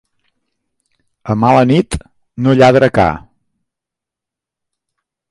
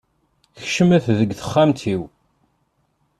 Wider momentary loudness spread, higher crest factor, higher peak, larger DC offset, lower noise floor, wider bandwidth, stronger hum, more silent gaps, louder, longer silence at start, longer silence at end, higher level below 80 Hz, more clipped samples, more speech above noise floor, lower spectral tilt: first, 16 LU vs 13 LU; about the same, 16 dB vs 18 dB; first, 0 dBFS vs -4 dBFS; neither; first, -84 dBFS vs -67 dBFS; about the same, 11.5 kHz vs 12.5 kHz; neither; neither; first, -12 LUFS vs -18 LUFS; first, 1.25 s vs 0.6 s; first, 2.15 s vs 1.15 s; first, -38 dBFS vs -54 dBFS; neither; first, 74 dB vs 49 dB; about the same, -7 dB/octave vs -6.5 dB/octave